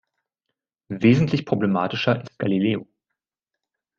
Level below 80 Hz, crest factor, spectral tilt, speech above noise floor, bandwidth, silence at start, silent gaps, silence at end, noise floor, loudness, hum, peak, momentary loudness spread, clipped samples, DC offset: -60 dBFS; 20 dB; -7.5 dB/octave; 65 dB; 7.4 kHz; 0.9 s; none; 1.15 s; -86 dBFS; -22 LUFS; none; -4 dBFS; 7 LU; under 0.1%; under 0.1%